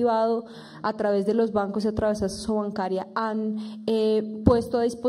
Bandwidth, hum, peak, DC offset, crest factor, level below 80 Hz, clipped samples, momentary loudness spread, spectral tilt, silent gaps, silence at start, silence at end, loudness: 13.5 kHz; none; -2 dBFS; under 0.1%; 22 dB; -46 dBFS; under 0.1%; 8 LU; -6.5 dB/octave; none; 0 s; 0 s; -25 LUFS